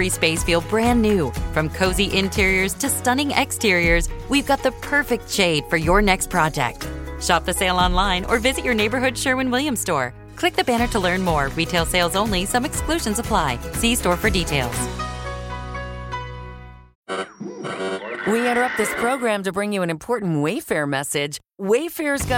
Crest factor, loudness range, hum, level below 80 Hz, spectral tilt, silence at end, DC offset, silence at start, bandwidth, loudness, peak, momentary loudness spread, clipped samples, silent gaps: 18 dB; 6 LU; none; -32 dBFS; -4 dB/octave; 0 s; under 0.1%; 0 s; 17 kHz; -21 LUFS; -2 dBFS; 11 LU; under 0.1%; 16.95-17.03 s